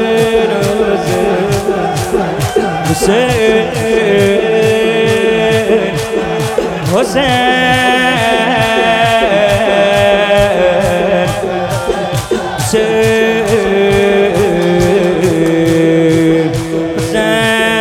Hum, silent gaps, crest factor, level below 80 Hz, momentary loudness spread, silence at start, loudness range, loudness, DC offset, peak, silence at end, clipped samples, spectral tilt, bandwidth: none; none; 10 dB; -34 dBFS; 6 LU; 0 s; 3 LU; -11 LUFS; under 0.1%; 0 dBFS; 0 s; under 0.1%; -5 dB/octave; 16.5 kHz